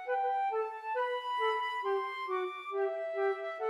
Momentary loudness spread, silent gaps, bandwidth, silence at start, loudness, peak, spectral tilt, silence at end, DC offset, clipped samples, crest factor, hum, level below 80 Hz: 4 LU; none; 11.5 kHz; 0 s; -34 LUFS; -20 dBFS; -1.5 dB/octave; 0 s; under 0.1%; under 0.1%; 14 dB; none; under -90 dBFS